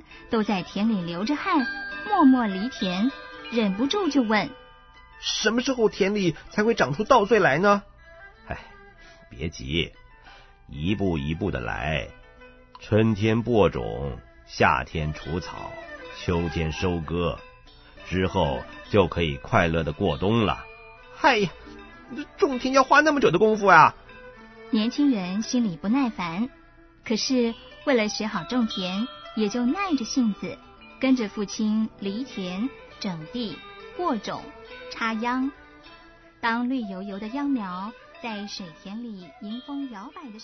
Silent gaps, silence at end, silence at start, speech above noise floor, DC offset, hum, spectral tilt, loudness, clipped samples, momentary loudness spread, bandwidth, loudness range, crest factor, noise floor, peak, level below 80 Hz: none; 0 s; 0.1 s; 27 dB; under 0.1%; none; -5.5 dB/octave; -24 LUFS; under 0.1%; 18 LU; 6.4 kHz; 10 LU; 22 dB; -51 dBFS; -2 dBFS; -46 dBFS